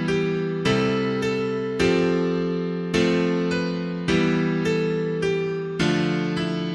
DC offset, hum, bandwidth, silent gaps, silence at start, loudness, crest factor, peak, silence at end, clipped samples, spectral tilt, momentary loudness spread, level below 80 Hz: under 0.1%; none; 11.5 kHz; none; 0 s; -23 LUFS; 16 dB; -6 dBFS; 0 s; under 0.1%; -6.5 dB/octave; 5 LU; -50 dBFS